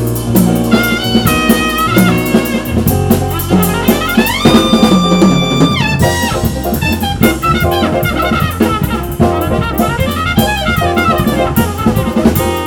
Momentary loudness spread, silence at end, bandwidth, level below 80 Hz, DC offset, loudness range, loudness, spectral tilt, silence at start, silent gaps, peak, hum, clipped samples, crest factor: 5 LU; 0 s; over 20 kHz; -26 dBFS; under 0.1%; 3 LU; -11 LUFS; -5.5 dB/octave; 0 s; none; 0 dBFS; none; 0.2%; 12 dB